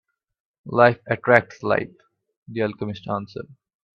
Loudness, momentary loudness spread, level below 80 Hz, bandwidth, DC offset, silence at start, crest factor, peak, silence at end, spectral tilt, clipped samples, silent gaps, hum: -21 LUFS; 19 LU; -62 dBFS; 6.8 kHz; under 0.1%; 0.65 s; 24 dB; 0 dBFS; 0.55 s; -7.5 dB/octave; under 0.1%; 2.37-2.42 s; none